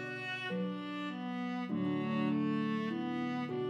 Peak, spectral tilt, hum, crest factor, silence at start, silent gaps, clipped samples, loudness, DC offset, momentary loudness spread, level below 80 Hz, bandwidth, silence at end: -24 dBFS; -7.5 dB/octave; none; 12 dB; 0 s; none; under 0.1%; -36 LUFS; under 0.1%; 6 LU; -86 dBFS; 9.4 kHz; 0 s